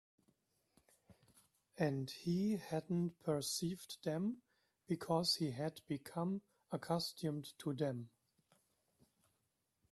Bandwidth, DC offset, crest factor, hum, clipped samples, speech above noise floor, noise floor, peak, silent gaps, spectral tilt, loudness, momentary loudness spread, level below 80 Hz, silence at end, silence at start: 13.5 kHz; under 0.1%; 20 dB; none; under 0.1%; 44 dB; -85 dBFS; -22 dBFS; none; -5.5 dB/octave; -41 LUFS; 9 LU; -78 dBFS; 1.85 s; 1.1 s